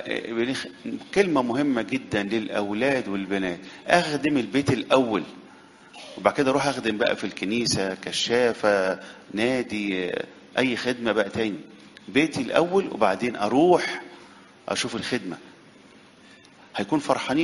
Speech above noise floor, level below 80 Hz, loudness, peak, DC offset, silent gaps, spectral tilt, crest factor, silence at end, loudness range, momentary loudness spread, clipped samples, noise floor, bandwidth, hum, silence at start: 27 dB; -60 dBFS; -24 LUFS; 0 dBFS; under 0.1%; none; -4.5 dB/octave; 24 dB; 0 s; 3 LU; 12 LU; under 0.1%; -51 dBFS; 11.5 kHz; none; 0 s